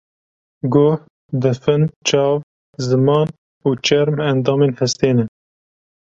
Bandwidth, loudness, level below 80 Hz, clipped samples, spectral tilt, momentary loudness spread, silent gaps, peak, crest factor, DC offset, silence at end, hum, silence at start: 7.8 kHz; -17 LUFS; -54 dBFS; under 0.1%; -6 dB/octave; 9 LU; 1.10-1.29 s, 1.96-2.01 s, 2.43-2.73 s, 3.38-3.61 s; -2 dBFS; 16 dB; under 0.1%; 0.75 s; none; 0.65 s